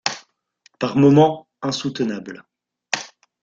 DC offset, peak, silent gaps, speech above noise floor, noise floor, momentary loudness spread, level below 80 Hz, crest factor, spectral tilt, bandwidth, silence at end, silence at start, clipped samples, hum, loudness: under 0.1%; 0 dBFS; none; 42 dB; -59 dBFS; 23 LU; -60 dBFS; 20 dB; -5.5 dB/octave; 7.6 kHz; 0.35 s; 0.05 s; under 0.1%; none; -19 LUFS